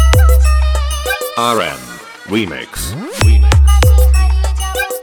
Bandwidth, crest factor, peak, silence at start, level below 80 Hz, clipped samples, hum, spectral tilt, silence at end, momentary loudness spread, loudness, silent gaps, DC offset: over 20 kHz; 10 dB; 0 dBFS; 0 s; -12 dBFS; under 0.1%; none; -5 dB/octave; 0 s; 12 LU; -13 LUFS; none; under 0.1%